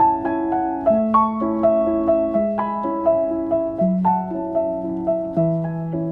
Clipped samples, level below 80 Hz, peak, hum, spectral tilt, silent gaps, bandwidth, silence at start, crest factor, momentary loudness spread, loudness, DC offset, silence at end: under 0.1%; -48 dBFS; -4 dBFS; none; -11.5 dB/octave; none; 3.6 kHz; 0 s; 16 dB; 6 LU; -20 LUFS; under 0.1%; 0 s